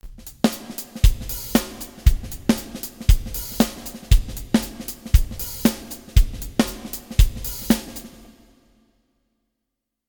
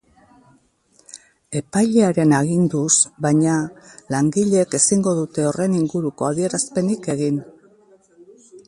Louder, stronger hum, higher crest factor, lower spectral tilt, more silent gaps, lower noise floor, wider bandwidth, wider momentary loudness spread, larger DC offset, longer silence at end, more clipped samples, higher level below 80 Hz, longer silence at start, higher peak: second, -23 LUFS vs -19 LUFS; neither; about the same, 20 dB vs 18 dB; about the same, -5 dB/octave vs -5 dB/octave; neither; first, -81 dBFS vs -58 dBFS; first, 19.5 kHz vs 11.5 kHz; first, 12 LU vs 8 LU; neither; first, 2 s vs 0.1 s; neither; first, -24 dBFS vs -60 dBFS; second, 0.05 s vs 1.15 s; about the same, -2 dBFS vs -2 dBFS